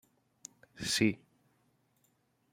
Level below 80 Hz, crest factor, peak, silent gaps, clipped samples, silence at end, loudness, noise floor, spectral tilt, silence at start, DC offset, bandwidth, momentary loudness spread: -68 dBFS; 26 dB; -14 dBFS; none; under 0.1%; 1.35 s; -32 LUFS; -74 dBFS; -3.5 dB/octave; 0.75 s; under 0.1%; 16 kHz; 23 LU